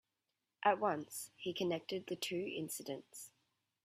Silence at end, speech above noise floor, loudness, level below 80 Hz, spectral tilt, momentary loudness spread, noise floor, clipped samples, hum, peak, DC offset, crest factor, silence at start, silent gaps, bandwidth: 0.55 s; 49 dB; -40 LUFS; -84 dBFS; -3.5 dB/octave; 14 LU; -89 dBFS; under 0.1%; none; -18 dBFS; under 0.1%; 24 dB; 0.6 s; none; 16 kHz